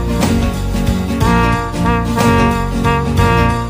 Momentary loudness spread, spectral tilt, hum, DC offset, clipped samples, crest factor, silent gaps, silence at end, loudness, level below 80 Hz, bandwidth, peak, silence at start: 5 LU; -6 dB/octave; none; under 0.1%; under 0.1%; 12 dB; none; 0 s; -14 LUFS; -22 dBFS; 16 kHz; 0 dBFS; 0 s